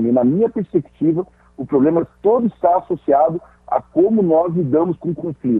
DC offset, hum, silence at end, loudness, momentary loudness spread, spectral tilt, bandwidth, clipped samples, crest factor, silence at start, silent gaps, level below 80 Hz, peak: under 0.1%; none; 0 s; -17 LUFS; 8 LU; -12 dB/octave; 3.8 kHz; under 0.1%; 14 dB; 0 s; none; -54 dBFS; -2 dBFS